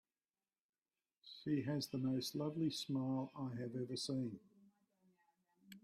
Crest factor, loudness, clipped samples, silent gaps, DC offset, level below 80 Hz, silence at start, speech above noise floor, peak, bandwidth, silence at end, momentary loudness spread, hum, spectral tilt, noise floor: 16 dB; -42 LUFS; under 0.1%; none; under 0.1%; -82 dBFS; 1.25 s; over 48 dB; -28 dBFS; 15 kHz; 0.05 s; 9 LU; none; -6 dB/octave; under -90 dBFS